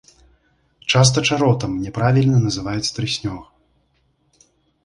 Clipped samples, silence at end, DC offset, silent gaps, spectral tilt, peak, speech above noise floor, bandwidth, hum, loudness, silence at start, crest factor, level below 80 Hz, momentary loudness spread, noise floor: under 0.1%; 1.4 s; under 0.1%; none; -5 dB/octave; -2 dBFS; 46 dB; 11 kHz; none; -18 LUFS; 0.85 s; 18 dB; -46 dBFS; 11 LU; -64 dBFS